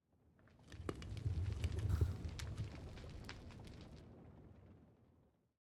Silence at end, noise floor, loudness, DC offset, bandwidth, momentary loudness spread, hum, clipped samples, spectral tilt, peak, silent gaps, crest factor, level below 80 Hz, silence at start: 0.7 s; -74 dBFS; -46 LUFS; under 0.1%; 12.5 kHz; 21 LU; none; under 0.1%; -6.5 dB/octave; -26 dBFS; none; 20 dB; -54 dBFS; 0.4 s